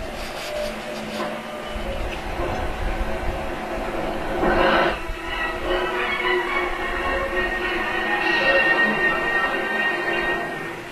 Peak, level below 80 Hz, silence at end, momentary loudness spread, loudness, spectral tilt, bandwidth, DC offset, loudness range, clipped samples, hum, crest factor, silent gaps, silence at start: -6 dBFS; -34 dBFS; 0 s; 11 LU; -23 LUFS; -4.5 dB/octave; 14 kHz; under 0.1%; 8 LU; under 0.1%; none; 18 dB; none; 0 s